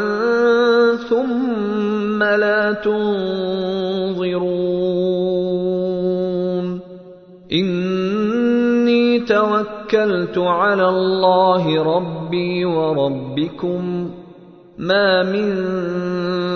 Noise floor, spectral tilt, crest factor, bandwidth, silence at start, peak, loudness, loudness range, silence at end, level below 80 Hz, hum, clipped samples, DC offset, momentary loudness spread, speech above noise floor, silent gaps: -42 dBFS; -7.5 dB/octave; 16 dB; 6.6 kHz; 0 s; -2 dBFS; -18 LUFS; 4 LU; 0 s; -54 dBFS; none; under 0.1%; under 0.1%; 7 LU; 25 dB; none